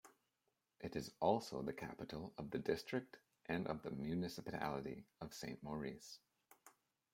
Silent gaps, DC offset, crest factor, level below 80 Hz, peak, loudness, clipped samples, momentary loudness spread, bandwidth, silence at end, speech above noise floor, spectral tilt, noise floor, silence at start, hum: none; under 0.1%; 24 dB; -72 dBFS; -22 dBFS; -45 LUFS; under 0.1%; 13 LU; 16.5 kHz; 0.45 s; 43 dB; -6 dB/octave; -88 dBFS; 0.05 s; none